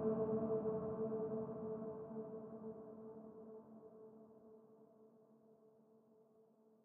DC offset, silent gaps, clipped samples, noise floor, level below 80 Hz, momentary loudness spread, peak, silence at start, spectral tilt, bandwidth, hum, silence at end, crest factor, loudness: under 0.1%; none; under 0.1%; -71 dBFS; -80 dBFS; 24 LU; -28 dBFS; 0 s; -8 dB/octave; 2.6 kHz; none; 0.4 s; 20 dB; -45 LUFS